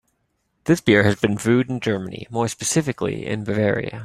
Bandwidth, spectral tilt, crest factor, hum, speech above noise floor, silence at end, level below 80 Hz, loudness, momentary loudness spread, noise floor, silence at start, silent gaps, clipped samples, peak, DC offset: 15 kHz; -5 dB/octave; 20 dB; none; 50 dB; 0 s; -54 dBFS; -21 LUFS; 10 LU; -70 dBFS; 0.65 s; none; under 0.1%; -2 dBFS; under 0.1%